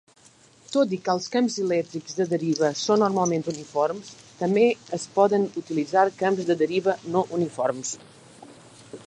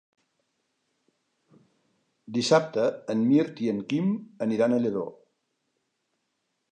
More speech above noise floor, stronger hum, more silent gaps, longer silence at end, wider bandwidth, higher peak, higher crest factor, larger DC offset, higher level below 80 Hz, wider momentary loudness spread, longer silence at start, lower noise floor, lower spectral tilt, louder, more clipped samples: second, 32 dB vs 53 dB; neither; neither; second, 0.05 s vs 1.6 s; about the same, 10.5 kHz vs 9.8 kHz; about the same, -6 dBFS vs -8 dBFS; about the same, 18 dB vs 20 dB; neither; about the same, -72 dBFS vs -76 dBFS; about the same, 9 LU vs 8 LU; second, 0.7 s vs 2.3 s; second, -55 dBFS vs -78 dBFS; about the same, -5 dB/octave vs -6 dB/octave; about the same, -24 LUFS vs -26 LUFS; neither